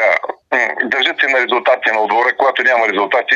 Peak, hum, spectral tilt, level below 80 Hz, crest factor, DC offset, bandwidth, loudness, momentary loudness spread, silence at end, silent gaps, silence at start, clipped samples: -2 dBFS; none; -2.5 dB/octave; -70 dBFS; 14 dB; under 0.1%; 7.6 kHz; -14 LUFS; 3 LU; 0 s; none; 0 s; under 0.1%